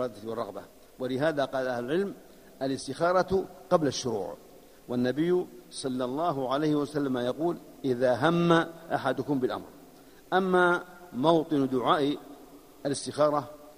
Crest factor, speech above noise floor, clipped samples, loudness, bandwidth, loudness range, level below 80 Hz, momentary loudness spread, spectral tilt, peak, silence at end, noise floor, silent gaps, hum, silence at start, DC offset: 20 dB; 25 dB; under 0.1%; -28 LUFS; 15.5 kHz; 3 LU; -62 dBFS; 12 LU; -5.5 dB/octave; -8 dBFS; 0.05 s; -52 dBFS; none; none; 0 s; under 0.1%